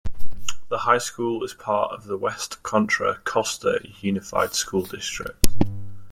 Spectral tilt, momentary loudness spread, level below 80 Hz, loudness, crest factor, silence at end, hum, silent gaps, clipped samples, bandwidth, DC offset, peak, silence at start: -3.5 dB/octave; 9 LU; -38 dBFS; -25 LUFS; 20 dB; 0 s; none; none; under 0.1%; 16.5 kHz; under 0.1%; 0 dBFS; 0.05 s